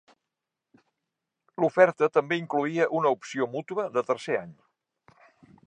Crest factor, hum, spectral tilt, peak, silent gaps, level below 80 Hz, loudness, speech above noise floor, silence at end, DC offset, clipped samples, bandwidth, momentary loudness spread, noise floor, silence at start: 24 dB; none; -6 dB/octave; -4 dBFS; none; -80 dBFS; -26 LUFS; 61 dB; 1.15 s; under 0.1%; under 0.1%; 9.6 kHz; 10 LU; -86 dBFS; 1.6 s